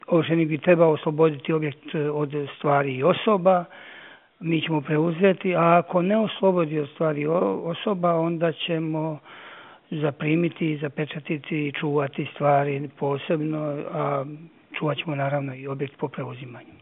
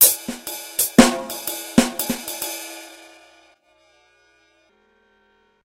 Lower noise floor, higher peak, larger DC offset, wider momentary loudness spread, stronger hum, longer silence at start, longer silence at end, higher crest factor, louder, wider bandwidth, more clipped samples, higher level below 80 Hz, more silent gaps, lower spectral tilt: second, -47 dBFS vs -61 dBFS; second, -4 dBFS vs 0 dBFS; neither; second, 14 LU vs 18 LU; neither; about the same, 0.1 s vs 0 s; second, 0.05 s vs 2.7 s; about the same, 20 dB vs 22 dB; second, -24 LUFS vs -20 LUFS; second, 4 kHz vs 17 kHz; neither; second, -78 dBFS vs -48 dBFS; neither; first, -5.5 dB/octave vs -2.5 dB/octave